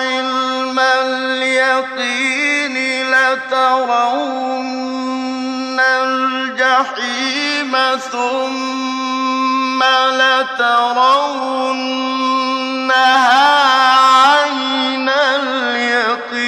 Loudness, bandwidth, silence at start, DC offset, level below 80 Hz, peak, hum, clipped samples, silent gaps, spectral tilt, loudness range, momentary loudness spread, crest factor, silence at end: -14 LUFS; 12.5 kHz; 0 s; under 0.1%; -68 dBFS; 0 dBFS; none; under 0.1%; none; -1 dB/octave; 5 LU; 10 LU; 14 dB; 0 s